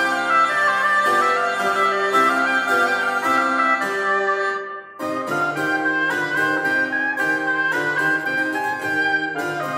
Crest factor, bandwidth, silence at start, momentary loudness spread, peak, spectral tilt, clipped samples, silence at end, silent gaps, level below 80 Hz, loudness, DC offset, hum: 14 dB; 16 kHz; 0 s; 6 LU; -6 dBFS; -3.5 dB/octave; under 0.1%; 0 s; none; -76 dBFS; -19 LUFS; under 0.1%; none